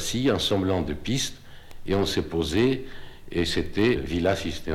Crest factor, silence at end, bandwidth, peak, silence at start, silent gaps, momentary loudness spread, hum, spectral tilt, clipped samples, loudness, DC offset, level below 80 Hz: 16 dB; 0 s; 16.5 kHz; -10 dBFS; 0 s; none; 9 LU; none; -5 dB/octave; under 0.1%; -25 LUFS; under 0.1%; -42 dBFS